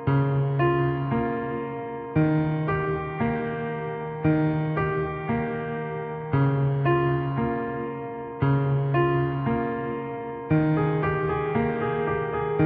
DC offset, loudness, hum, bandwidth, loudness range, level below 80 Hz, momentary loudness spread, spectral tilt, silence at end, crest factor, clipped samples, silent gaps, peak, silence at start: under 0.1%; -26 LUFS; none; 4.2 kHz; 2 LU; -48 dBFS; 8 LU; -8 dB/octave; 0 s; 14 dB; under 0.1%; none; -10 dBFS; 0 s